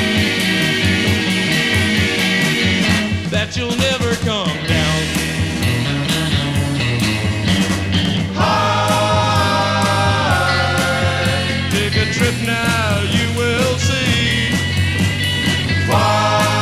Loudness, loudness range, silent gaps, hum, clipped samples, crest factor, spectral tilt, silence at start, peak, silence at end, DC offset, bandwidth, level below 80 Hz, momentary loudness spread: -16 LUFS; 2 LU; none; none; under 0.1%; 12 dB; -4.5 dB/octave; 0 s; -4 dBFS; 0 s; under 0.1%; 15.5 kHz; -36 dBFS; 3 LU